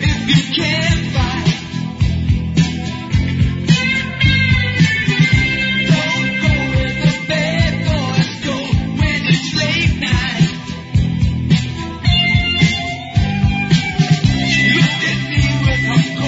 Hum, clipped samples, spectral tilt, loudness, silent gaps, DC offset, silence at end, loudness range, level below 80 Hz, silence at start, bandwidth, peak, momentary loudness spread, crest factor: none; under 0.1%; -5.5 dB/octave; -15 LUFS; none; under 0.1%; 0 s; 3 LU; -26 dBFS; 0 s; 7.8 kHz; 0 dBFS; 6 LU; 14 dB